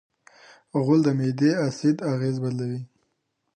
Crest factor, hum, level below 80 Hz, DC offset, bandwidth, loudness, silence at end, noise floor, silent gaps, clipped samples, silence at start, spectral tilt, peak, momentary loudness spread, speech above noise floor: 16 dB; none; -70 dBFS; under 0.1%; 9.6 kHz; -24 LUFS; 0.7 s; -75 dBFS; none; under 0.1%; 0.75 s; -7.5 dB/octave; -8 dBFS; 10 LU; 53 dB